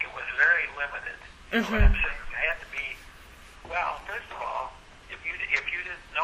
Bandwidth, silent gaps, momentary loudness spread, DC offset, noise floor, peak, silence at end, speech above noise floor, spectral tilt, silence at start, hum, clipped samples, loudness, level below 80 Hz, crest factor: 14.5 kHz; none; 17 LU; under 0.1%; -49 dBFS; -8 dBFS; 0 s; 21 dB; -5.5 dB/octave; 0 s; none; under 0.1%; -28 LUFS; -32 dBFS; 20 dB